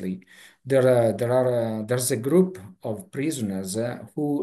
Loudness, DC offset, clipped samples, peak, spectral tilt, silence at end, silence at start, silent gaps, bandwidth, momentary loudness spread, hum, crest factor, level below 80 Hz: -24 LUFS; under 0.1%; under 0.1%; -8 dBFS; -6 dB/octave; 0 s; 0 s; none; 13 kHz; 14 LU; none; 16 dB; -68 dBFS